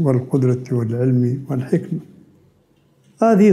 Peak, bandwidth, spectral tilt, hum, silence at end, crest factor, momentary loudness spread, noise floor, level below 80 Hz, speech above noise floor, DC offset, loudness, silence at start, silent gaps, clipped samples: -4 dBFS; 12 kHz; -9.5 dB/octave; none; 0 s; 16 dB; 7 LU; -57 dBFS; -62 dBFS; 41 dB; under 0.1%; -19 LUFS; 0 s; none; under 0.1%